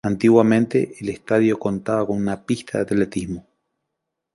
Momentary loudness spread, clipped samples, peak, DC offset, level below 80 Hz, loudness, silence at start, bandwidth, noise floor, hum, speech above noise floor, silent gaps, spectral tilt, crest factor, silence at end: 13 LU; under 0.1%; -2 dBFS; under 0.1%; -52 dBFS; -20 LUFS; 0.05 s; 11.5 kHz; -80 dBFS; none; 60 dB; none; -7 dB/octave; 18 dB; 0.95 s